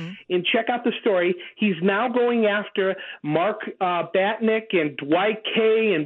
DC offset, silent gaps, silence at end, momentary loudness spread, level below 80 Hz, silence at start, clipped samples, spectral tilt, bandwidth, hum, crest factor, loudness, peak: under 0.1%; none; 0 s; 5 LU; -76 dBFS; 0 s; under 0.1%; -8.5 dB/octave; 4.2 kHz; none; 14 dB; -22 LUFS; -8 dBFS